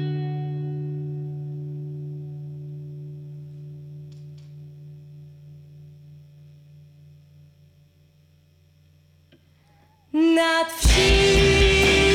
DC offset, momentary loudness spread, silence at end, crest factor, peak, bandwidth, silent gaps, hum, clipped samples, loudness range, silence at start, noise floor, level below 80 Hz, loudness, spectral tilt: under 0.1%; 27 LU; 0 s; 18 dB; -8 dBFS; 16.5 kHz; none; none; under 0.1%; 26 LU; 0 s; -57 dBFS; -32 dBFS; -21 LUFS; -4.5 dB/octave